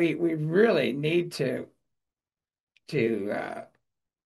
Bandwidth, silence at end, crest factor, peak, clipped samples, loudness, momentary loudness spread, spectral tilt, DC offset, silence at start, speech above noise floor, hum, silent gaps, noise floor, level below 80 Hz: 12.5 kHz; 0.6 s; 18 dB; -10 dBFS; under 0.1%; -27 LUFS; 14 LU; -6.5 dB/octave; under 0.1%; 0 s; over 64 dB; none; 2.60-2.67 s; under -90 dBFS; -74 dBFS